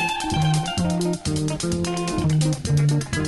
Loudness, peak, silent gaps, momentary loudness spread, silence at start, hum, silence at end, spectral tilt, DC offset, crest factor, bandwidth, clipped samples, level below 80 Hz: -22 LUFS; -8 dBFS; none; 4 LU; 0 s; none; 0 s; -5.5 dB/octave; under 0.1%; 12 dB; 12 kHz; under 0.1%; -40 dBFS